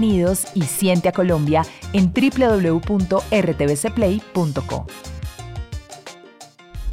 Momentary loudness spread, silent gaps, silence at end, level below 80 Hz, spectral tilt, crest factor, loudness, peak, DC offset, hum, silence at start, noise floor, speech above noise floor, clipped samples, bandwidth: 17 LU; none; 0 s; -38 dBFS; -6 dB/octave; 14 dB; -19 LUFS; -6 dBFS; under 0.1%; none; 0 s; -44 dBFS; 25 dB; under 0.1%; 16 kHz